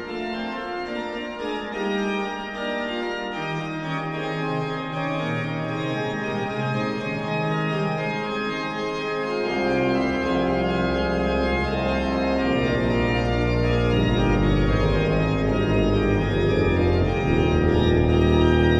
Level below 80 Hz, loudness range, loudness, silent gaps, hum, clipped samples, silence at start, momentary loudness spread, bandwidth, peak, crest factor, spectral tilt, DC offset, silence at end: -32 dBFS; 6 LU; -23 LUFS; none; none; under 0.1%; 0 s; 8 LU; 10 kHz; -6 dBFS; 18 dB; -7 dB/octave; under 0.1%; 0 s